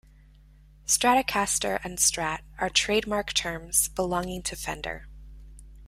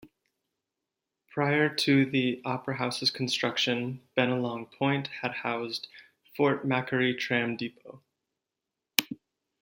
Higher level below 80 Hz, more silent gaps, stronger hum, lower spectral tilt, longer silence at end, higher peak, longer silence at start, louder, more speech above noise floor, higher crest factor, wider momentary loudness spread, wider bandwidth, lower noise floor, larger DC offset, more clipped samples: first, -48 dBFS vs -74 dBFS; neither; neither; second, -1.5 dB/octave vs -4.5 dB/octave; second, 0 s vs 0.45 s; second, -8 dBFS vs 0 dBFS; first, 0.85 s vs 0.05 s; first, -25 LUFS vs -28 LUFS; second, 27 dB vs 59 dB; second, 20 dB vs 30 dB; about the same, 11 LU vs 12 LU; about the same, 16 kHz vs 16.5 kHz; second, -53 dBFS vs -88 dBFS; neither; neither